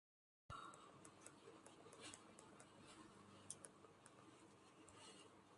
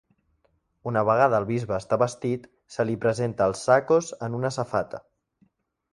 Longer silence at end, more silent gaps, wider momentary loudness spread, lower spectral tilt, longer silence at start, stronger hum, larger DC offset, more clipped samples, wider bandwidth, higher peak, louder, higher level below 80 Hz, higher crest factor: second, 0 s vs 0.95 s; neither; second, 9 LU vs 13 LU; second, -3 dB/octave vs -6 dB/octave; second, 0.5 s vs 0.85 s; neither; neither; neither; about the same, 11.5 kHz vs 11.5 kHz; second, -32 dBFS vs -6 dBFS; second, -62 LUFS vs -25 LUFS; second, -82 dBFS vs -58 dBFS; first, 30 dB vs 20 dB